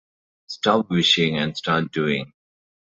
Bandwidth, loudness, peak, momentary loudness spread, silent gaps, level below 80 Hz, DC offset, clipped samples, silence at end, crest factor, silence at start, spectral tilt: 8 kHz; -21 LUFS; -4 dBFS; 10 LU; none; -58 dBFS; under 0.1%; under 0.1%; 0.7 s; 20 dB; 0.5 s; -4.5 dB/octave